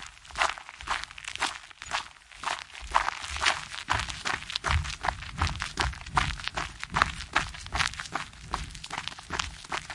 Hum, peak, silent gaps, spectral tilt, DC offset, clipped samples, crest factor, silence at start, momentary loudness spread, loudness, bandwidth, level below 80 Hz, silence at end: none; -2 dBFS; none; -2.5 dB/octave; under 0.1%; under 0.1%; 30 dB; 0 s; 9 LU; -31 LUFS; 11.5 kHz; -42 dBFS; 0 s